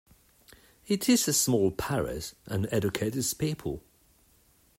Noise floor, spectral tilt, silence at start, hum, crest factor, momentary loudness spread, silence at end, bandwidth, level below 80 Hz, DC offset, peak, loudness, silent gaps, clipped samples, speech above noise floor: -64 dBFS; -4 dB/octave; 0.85 s; none; 18 dB; 12 LU; 1 s; 16 kHz; -54 dBFS; under 0.1%; -12 dBFS; -28 LUFS; none; under 0.1%; 35 dB